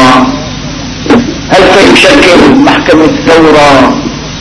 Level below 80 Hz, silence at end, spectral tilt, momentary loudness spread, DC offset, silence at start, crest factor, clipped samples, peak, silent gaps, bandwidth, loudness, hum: -26 dBFS; 0 s; -4.5 dB/octave; 14 LU; under 0.1%; 0 s; 4 dB; 20%; 0 dBFS; none; 11 kHz; -3 LUFS; none